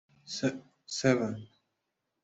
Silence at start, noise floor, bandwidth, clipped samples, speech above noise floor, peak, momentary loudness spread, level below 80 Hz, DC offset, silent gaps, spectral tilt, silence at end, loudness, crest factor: 0.25 s; -84 dBFS; 8.2 kHz; under 0.1%; 53 dB; -12 dBFS; 15 LU; -72 dBFS; under 0.1%; none; -5 dB/octave; 0.8 s; -32 LUFS; 22 dB